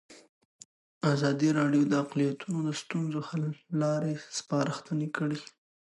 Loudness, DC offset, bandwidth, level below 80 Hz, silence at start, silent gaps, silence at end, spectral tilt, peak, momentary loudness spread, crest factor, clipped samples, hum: -30 LUFS; under 0.1%; 11.5 kHz; -78 dBFS; 0.1 s; 0.29-0.59 s, 0.65-1.01 s; 0.5 s; -6 dB/octave; -12 dBFS; 8 LU; 18 dB; under 0.1%; none